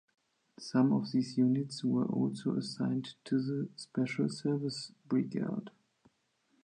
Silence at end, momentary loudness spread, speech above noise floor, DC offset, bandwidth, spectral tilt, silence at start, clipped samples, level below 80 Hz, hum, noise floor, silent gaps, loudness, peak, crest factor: 0.95 s; 9 LU; 43 dB; under 0.1%; 10 kHz; -6.5 dB/octave; 0.6 s; under 0.1%; -80 dBFS; none; -75 dBFS; none; -34 LUFS; -16 dBFS; 18 dB